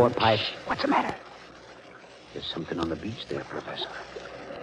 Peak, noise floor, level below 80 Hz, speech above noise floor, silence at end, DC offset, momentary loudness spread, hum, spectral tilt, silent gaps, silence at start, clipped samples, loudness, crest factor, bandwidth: -8 dBFS; -49 dBFS; -58 dBFS; 20 dB; 0 s; under 0.1%; 23 LU; none; -5.5 dB/octave; none; 0 s; under 0.1%; -29 LUFS; 22 dB; 11.5 kHz